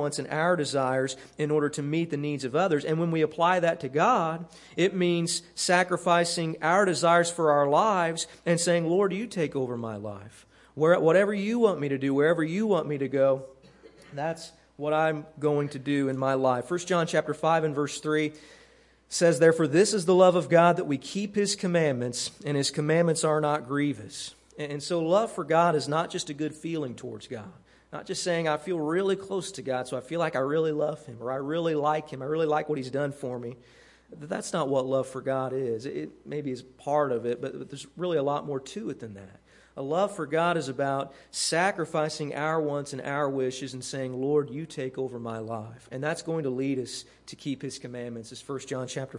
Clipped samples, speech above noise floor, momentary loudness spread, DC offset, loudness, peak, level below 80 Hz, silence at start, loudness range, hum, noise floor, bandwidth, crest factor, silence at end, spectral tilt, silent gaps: under 0.1%; 31 dB; 14 LU; under 0.1%; -27 LUFS; -6 dBFS; -68 dBFS; 0 s; 8 LU; none; -58 dBFS; 11.5 kHz; 22 dB; 0 s; -5 dB/octave; none